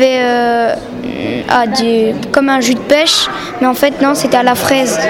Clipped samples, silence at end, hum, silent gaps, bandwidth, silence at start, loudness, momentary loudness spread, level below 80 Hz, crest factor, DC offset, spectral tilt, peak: under 0.1%; 0 s; none; none; 18 kHz; 0 s; -12 LUFS; 7 LU; -44 dBFS; 12 dB; under 0.1%; -3 dB/octave; 0 dBFS